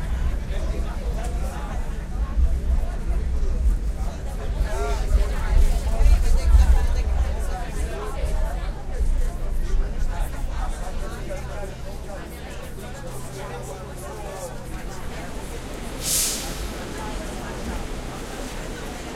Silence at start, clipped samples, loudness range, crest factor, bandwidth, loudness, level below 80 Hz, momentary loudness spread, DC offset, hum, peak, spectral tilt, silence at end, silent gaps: 0 s; under 0.1%; 11 LU; 18 dB; 16 kHz; -28 LUFS; -24 dBFS; 13 LU; under 0.1%; none; -4 dBFS; -4.5 dB/octave; 0 s; none